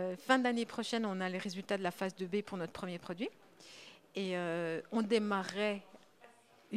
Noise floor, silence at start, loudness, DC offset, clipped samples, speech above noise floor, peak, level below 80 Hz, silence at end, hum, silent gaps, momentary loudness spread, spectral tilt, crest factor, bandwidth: -63 dBFS; 0 s; -37 LUFS; under 0.1%; under 0.1%; 27 dB; -14 dBFS; -78 dBFS; 0 s; none; none; 12 LU; -5 dB/octave; 24 dB; 15 kHz